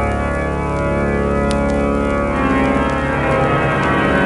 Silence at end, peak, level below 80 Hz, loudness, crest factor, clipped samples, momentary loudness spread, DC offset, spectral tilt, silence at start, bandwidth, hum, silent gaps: 0 s; -2 dBFS; -26 dBFS; -17 LUFS; 14 dB; under 0.1%; 4 LU; under 0.1%; -7 dB/octave; 0 s; 11.5 kHz; none; none